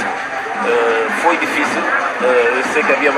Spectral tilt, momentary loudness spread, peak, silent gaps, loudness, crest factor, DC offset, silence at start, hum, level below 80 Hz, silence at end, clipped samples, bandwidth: -3 dB/octave; 6 LU; -2 dBFS; none; -15 LUFS; 14 dB; under 0.1%; 0 s; none; -58 dBFS; 0 s; under 0.1%; 14 kHz